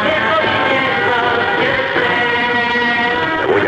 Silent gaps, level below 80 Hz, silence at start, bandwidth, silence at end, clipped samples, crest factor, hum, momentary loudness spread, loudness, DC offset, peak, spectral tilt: none; -46 dBFS; 0 s; 10.5 kHz; 0 s; under 0.1%; 10 dB; none; 1 LU; -14 LUFS; under 0.1%; -4 dBFS; -5 dB/octave